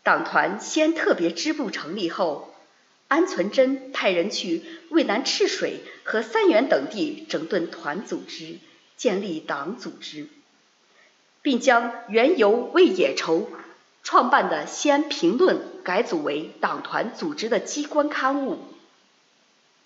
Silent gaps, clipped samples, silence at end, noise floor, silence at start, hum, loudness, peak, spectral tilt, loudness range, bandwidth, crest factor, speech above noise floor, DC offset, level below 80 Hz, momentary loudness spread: none; under 0.1%; 1.1 s; -62 dBFS; 0.05 s; none; -23 LUFS; -4 dBFS; -3.5 dB/octave; 8 LU; 8 kHz; 20 dB; 39 dB; under 0.1%; -86 dBFS; 14 LU